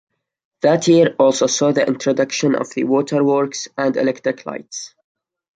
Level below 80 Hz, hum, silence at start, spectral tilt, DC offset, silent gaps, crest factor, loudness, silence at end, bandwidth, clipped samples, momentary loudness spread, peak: -66 dBFS; none; 0.65 s; -4.5 dB/octave; under 0.1%; none; 16 dB; -17 LUFS; 0.7 s; 9.4 kHz; under 0.1%; 15 LU; -2 dBFS